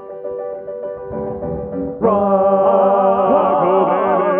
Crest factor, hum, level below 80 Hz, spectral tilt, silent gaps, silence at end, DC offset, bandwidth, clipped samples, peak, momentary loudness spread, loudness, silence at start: 14 dB; none; -46 dBFS; -12 dB/octave; none; 0 s; under 0.1%; 3.5 kHz; under 0.1%; -2 dBFS; 14 LU; -16 LUFS; 0 s